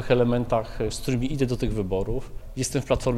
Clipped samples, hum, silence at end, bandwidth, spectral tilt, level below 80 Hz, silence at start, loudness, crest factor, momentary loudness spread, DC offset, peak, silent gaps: under 0.1%; none; 0 s; 15.5 kHz; -6 dB/octave; -36 dBFS; 0 s; -26 LUFS; 18 dB; 9 LU; under 0.1%; -8 dBFS; none